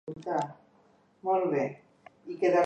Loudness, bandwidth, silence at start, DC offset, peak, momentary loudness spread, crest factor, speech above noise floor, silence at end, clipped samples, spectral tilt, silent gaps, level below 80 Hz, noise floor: -31 LUFS; 8.6 kHz; 0.05 s; under 0.1%; -14 dBFS; 18 LU; 18 dB; 36 dB; 0 s; under 0.1%; -7 dB/octave; none; -76 dBFS; -64 dBFS